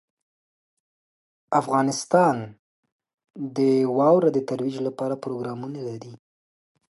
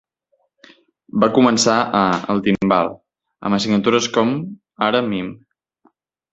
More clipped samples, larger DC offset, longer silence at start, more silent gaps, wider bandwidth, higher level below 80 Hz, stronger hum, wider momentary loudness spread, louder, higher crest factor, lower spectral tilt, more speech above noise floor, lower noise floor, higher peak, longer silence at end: neither; neither; first, 1.5 s vs 1.15 s; first, 2.59-2.83 s, 2.92-2.99 s, 3.14-3.18 s vs none; first, 11.5 kHz vs 8.2 kHz; second, -72 dBFS vs -54 dBFS; neither; first, 15 LU vs 12 LU; second, -23 LUFS vs -18 LUFS; about the same, 20 dB vs 18 dB; first, -6 dB/octave vs -4.5 dB/octave; first, over 67 dB vs 50 dB; first, under -90 dBFS vs -67 dBFS; second, -6 dBFS vs -2 dBFS; second, 0.8 s vs 0.95 s